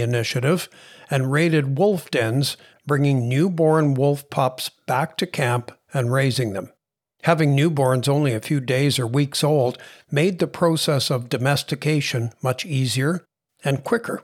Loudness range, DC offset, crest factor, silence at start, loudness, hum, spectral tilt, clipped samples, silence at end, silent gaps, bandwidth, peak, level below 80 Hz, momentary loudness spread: 2 LU; under 0.1%; 18 dB; 0 s; -21 LUFS; none; -5.5 dB/octave; under 0.1%; 0.05 s; none; 16 kHz; -4 dBFS; -70 dBFS; 7 LU